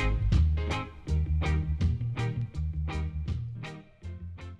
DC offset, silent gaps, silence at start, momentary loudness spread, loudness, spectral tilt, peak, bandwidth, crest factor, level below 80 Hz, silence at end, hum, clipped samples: under 0.1%; none; 0 s; 16 LU; -31 LUFS; -7 dB/octave; -12 dBFS; 8 kHz; 18 dB; -32 dBFS; 0 s; none; under 0.1%